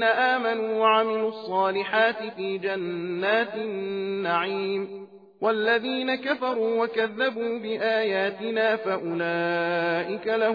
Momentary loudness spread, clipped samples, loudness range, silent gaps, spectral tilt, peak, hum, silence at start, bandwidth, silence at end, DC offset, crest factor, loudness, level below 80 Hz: 7 LU; under 0.1%; 2 LU; none; -7 dB/octave; -8 dBFS; none; 0 s; 5 kHz; 0 s; under 0.1%; 16 dB; -25 LUFS; -80 dBFS